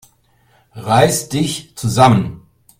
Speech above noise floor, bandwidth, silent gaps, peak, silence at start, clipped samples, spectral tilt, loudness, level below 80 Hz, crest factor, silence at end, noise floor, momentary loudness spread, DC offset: 41 dB; 16 kHz; none; 0 dBFS; 0.75 s; under 0.1%; -5 dB/octave; -15 LUFS; -46 dBFS; 16 dB; 0.4 s; -55 dBFS; 12 LU; under 0.1%